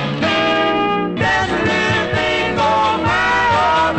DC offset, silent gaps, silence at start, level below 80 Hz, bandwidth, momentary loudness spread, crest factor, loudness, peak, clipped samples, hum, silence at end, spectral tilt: under 0.1%; none; 0 s; -40 dBFS; 9 kHz; 3 LU; 12 dB; -15 LUFS; -4 dBFS; under 0.1%; none; 0 s; -5 dB/octave